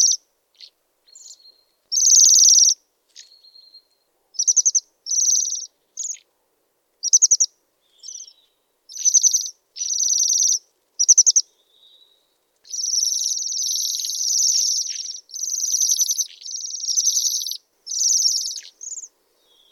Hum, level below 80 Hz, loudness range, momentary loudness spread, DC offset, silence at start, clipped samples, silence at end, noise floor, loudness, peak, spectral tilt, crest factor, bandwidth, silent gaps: none; -88 dBFS; 5 LU; 19 LU; under 0.1%; 0 s; under 0.1%; 0.65 s; -69 dBFS; -16 LUFS; -2 dBFS; 8.5 dB/octave; 20 dB; 19 kHz; none